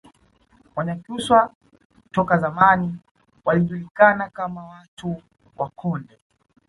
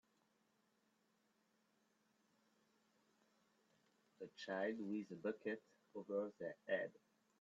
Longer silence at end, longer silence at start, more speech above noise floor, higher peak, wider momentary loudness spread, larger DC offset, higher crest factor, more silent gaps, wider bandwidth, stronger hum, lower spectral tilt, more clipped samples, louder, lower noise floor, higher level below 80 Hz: first, 0.65 s vs 0.5 s; second, 0.75 s vs 4.2 s; about the same, 38 dB vs 35 dB; first, -2 dBFS vs -30 dBFS; first, 17 LU vs 12 LU; neither; about the same, 22 dB vs 22 dB; first, 1.55-1.61 s, 1.85-1.90 s, 3.11-3.15 s, 3.91-3.95 s, 4.88-4.97 s vs none; first, 11.5 kHz vs 7.6 kHz; neither; first, -6.5 dB/octave vs -4.5 dB/octave; neither; first, -21 LUFS vs -47 LUFS; second, -58 dBFS vs -82 dBFS; first, -56 dBFS vs under -90 dBFS